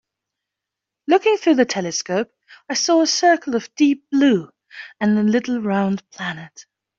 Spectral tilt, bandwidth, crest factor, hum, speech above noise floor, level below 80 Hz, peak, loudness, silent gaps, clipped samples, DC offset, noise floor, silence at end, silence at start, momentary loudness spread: -4 dB/octave; 7.8 kHz; 16 dB; none; 66 dB; -66 dBFS; -4 dBFS; -19 LUFS; none; under 0.1%; under 0.1%; -84 dBFS; 0.35 s; 1.1 s; 14 LU